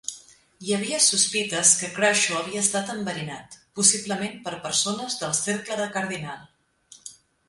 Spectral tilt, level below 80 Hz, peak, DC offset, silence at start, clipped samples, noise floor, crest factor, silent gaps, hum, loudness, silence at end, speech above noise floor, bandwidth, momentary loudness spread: -1.5 dB/octave; -66 dBFS; -4 dBFS; under 0.1%; 0.1 s; under 0.1%; -54 dBFS; 22 dB; none; none; -22 LUFS; 0.35 s; 29 dB; 11.5 kHz; 20 LU